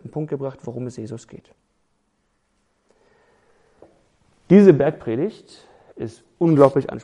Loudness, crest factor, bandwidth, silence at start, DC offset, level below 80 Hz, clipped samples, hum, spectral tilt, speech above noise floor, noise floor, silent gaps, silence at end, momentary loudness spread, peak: -18 LUFS; 22 dB; 10 kHz; 0.05 s; under 0.1%; -58 dBFS; under 0.1%; none; -9 dB/octave; 50 dB; -68 dBFS; none; 0.05 s; 22 LU; 0 dBFS